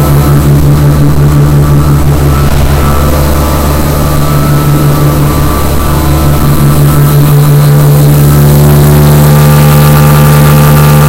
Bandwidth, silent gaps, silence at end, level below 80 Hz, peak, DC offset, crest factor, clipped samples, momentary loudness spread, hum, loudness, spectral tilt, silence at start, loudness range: 17 kHz; none; 0 s; -12 dBFS; 0 dBFS; under 0.1%; 4 dB; 6%; 5 LU; none; -5 LUFS; -6.5 dB/octave; 0 s; 4 LU